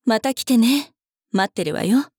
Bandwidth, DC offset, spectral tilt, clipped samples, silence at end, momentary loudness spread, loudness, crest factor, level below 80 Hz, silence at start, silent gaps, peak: over 20 kHz; under 0.1%; -4.5 dB/octave; under 0.1%; 0.15 s; 8 LU; -20 LUFS; 12 dB; -68 dBFS; 0.05 s; none; -8 dBFS